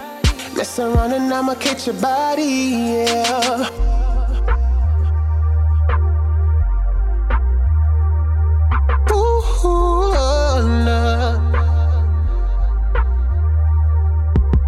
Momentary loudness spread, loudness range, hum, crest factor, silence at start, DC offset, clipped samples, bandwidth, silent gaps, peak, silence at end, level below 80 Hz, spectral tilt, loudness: 4 LU; 2 LU; none; 12 dB; 0 s; under 0.1%; under 0.1%; 13 kHz; none; -2 dBFS; 0 s; -16 dBFS; -6 dB/octave; -18 LUFS